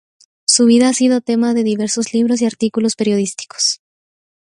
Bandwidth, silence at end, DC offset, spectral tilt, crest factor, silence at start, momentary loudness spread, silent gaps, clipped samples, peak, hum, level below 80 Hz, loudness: 11.5 kHz; 0.75 s; under 0.1%; -3.5 dB/octave; 16 dB; 0.5 s; 7 LU; none; under 0.1%; 0 dBFS; none; -62 dBFS; -15 LUFS